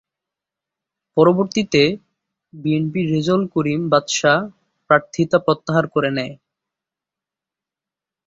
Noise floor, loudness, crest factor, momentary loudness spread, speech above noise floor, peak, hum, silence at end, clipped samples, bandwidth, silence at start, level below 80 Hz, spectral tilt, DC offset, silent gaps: -88 dBFS; -18 LUFS; 18 dB; 9 LU; 70 dB; -2 dBFS; none; 1.95 s; under 0.1%; 7.8 kHz; 1.15 s; -58 dBFS; -5.5 dB/octave; under 0.1%; none